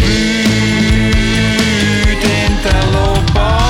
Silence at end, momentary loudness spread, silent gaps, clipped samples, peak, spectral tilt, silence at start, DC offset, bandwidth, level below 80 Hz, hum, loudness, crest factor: 0 s; 1 LU; none; under 0.1%; 0 dBFS; -5 dB/octave; 0 s; under 0.1%; 16.5 kHz; -18 dBFS; none; -12 LUFS; 12 dB